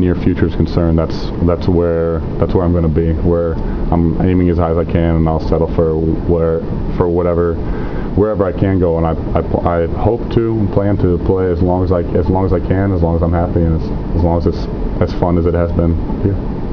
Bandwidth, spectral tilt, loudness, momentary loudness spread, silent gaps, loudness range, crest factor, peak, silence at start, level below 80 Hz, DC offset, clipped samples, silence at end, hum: 5.4 kHz; -10.5 dB/octave; -15 LUFS; 4 LU; none; 1 LU; 14 dB; 0 dBFS; 0 s; -22 dBFS; under 0.1%; under 0.1%; 0 s; none